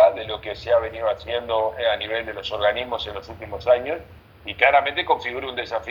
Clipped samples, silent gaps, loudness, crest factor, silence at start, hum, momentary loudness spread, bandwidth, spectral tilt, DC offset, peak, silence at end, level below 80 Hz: under 0.1%; none; -23 LUFS; 22 dB; 0 s; none; 13 LU; 19 kHz; -5 dB/octave; under 0.1%; -2 dBFS; 0 s; -50 dBFS